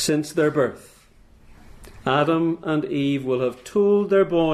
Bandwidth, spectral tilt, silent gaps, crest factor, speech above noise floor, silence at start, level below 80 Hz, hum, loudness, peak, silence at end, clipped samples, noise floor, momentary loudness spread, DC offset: 14.5 kHz; -5.5 dB/octave; none; 16 dB; 31 dB; 0 s; -52 dBFS; none; -21 LUFS; -6 dBFS; 0 s; under 0.1%; -52 dBFS; 6 LU; under 0.1%